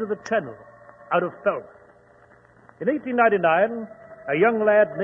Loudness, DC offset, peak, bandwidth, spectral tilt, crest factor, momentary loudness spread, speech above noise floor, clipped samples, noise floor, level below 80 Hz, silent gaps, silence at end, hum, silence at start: -22 LUFS; under 0.1%; -4 dBFS; 7 kHz; -7 dB/octave; 18 dB; 16 LU; 32 dB; under 0.1%; -53 dBFS; -68 dBFS; none; 0 s; none; 0 s